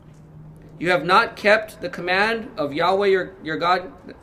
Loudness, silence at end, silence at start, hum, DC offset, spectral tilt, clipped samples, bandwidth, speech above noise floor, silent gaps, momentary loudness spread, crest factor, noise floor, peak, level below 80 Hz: -20 LUFS; 0.1 s; 0.25 s; none; under 0.1%; -5 dB/octave; under 0.1%; 15 kHz; 23 dB; none; 12 LU; 18 dB; -43 dBFS; -4 dBFS; -54 dBFS